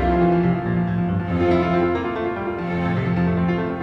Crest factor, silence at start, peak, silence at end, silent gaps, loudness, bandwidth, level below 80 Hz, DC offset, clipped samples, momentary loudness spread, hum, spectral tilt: 12 dB; 0 s; -8 dBFS; 0 s; none; -21 LUFS; 5.8 kHz; -36 dBFS; under 0.1%; under 0.1%; 6 LU; none; -9.5 dB/octave